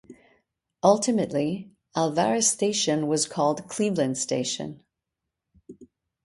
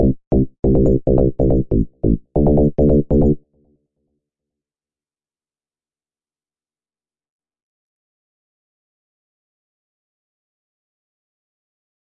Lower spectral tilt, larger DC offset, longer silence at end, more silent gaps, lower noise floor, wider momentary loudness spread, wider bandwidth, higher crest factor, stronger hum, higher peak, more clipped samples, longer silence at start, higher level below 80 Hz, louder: second, -4 dB/octave vs -14 dB/octave; neither; second, 0.4 s vs 8.65 s; second, none vs 0.27-0.31 s, 0.59-0.63 s; second, -85 dBFS vs under -90 dBFS; first, 9 LU vs 5 LU; first, 11.5 kHz vs 1.8 kHz; about the same, 20 dB vs 16 dB; neither; about the same, -6 dBFS vs -4 dBFS; neither; about the same, 0.1 s vs 0 s; second, -68 dBFS vs -28 dBFS; second, -24 LUFS vs -17 LUFS